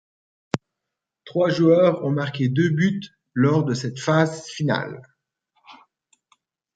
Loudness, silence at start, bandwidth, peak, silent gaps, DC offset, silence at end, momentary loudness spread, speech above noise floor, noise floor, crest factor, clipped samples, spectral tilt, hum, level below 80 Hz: -22 LUFS; 0.55 s; 9.2 kHz; -2 dBFS; none; under 0.1%; 1 s; 14 LU; 64 dB; -84 dBFS; 22 dB; under 0.1%; -7 dB/octave; none; -64 dBFS